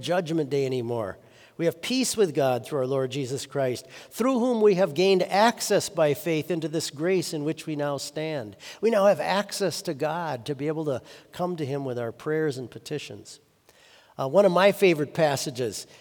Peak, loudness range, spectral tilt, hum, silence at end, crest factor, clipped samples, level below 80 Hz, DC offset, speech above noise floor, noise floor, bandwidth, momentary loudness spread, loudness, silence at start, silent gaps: -6 dBFS; 7 LU; -5 dB/octave; none; 0.15 s; 20 dB; under 0.1%; -72 dBFS; under 0.1%; 32 dB; -57 dBFS; over 20 kHz; 13 LU; -25 LUFS; 0 s; none